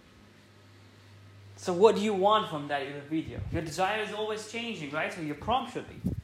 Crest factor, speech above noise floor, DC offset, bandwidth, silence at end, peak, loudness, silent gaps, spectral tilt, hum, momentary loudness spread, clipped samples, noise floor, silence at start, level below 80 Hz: 24 dB; 27 dB; under 0.1%; 14.5 kHz; 0 s; -6 dBFS; -30 LUFS; none; -5 dB/octave; none; 12 LU; under 0.1%; -56 dBFS; 0.8 s; -54 dBFS